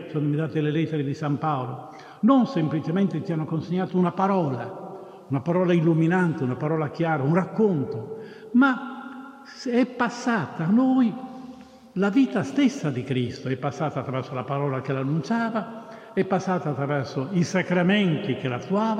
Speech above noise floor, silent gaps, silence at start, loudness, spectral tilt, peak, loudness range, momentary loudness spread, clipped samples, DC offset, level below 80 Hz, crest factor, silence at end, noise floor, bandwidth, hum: 21 dB; none; 0 s; -24 LUFS; -7.5 dB/octave; -8 dBFS; 3 LU; 15 LU; under 0.1%; under 0.1%; -70 dBFS; 16 dB; 0 s; -45 dBFS; 9.6 kHz; none